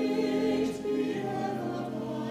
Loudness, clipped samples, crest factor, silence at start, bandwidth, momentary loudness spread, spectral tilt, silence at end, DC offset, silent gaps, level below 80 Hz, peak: -31 LUFS; under 0.1%; 14 dB; 0 s; 15.5 kHz; 7 LU; -6.5 dB/octave; 0 s; under 0.1%; none; -64 dBFS; -18 dBFS